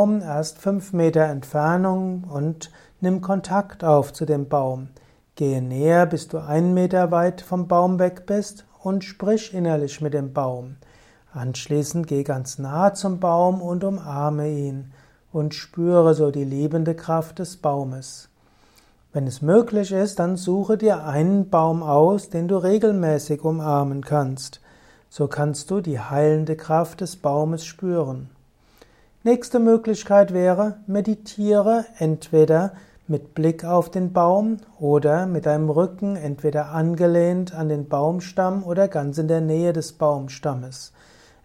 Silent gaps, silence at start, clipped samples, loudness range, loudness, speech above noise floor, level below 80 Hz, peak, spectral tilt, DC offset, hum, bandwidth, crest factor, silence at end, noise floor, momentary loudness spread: none; 0 s; under 0.1%; 4 LU; -21 LUFS; 35 dB; -58 dBFS; -4 dBFS; -7.5 dB/octave; under 0.1%; none; 15.5 kHz; 18 dB; 0.6 s; -56 dBFS; 10 LU